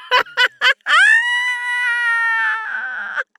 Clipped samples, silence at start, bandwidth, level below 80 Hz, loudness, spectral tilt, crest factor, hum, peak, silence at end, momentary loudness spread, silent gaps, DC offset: under 0.1%; 0 s; 19 kHz; -76 dBFS; -15 LUFS; 2.5 dB/octave; 14 dB; none; -4 dBFS; 0.15 s; 12 LU; none; under 0.1%